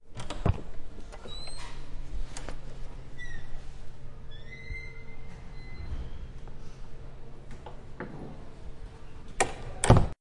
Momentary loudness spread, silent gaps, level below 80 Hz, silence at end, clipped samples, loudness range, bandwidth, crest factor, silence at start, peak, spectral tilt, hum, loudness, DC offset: 17 LU; none; -38 dBFS; 0.1 s; under 0.1%; 7 LU; 11.5 kHz; 30 dB; 0 s; -2 dBFS; -5.5 dB/octave; none; -34 LUFS; under 0.1%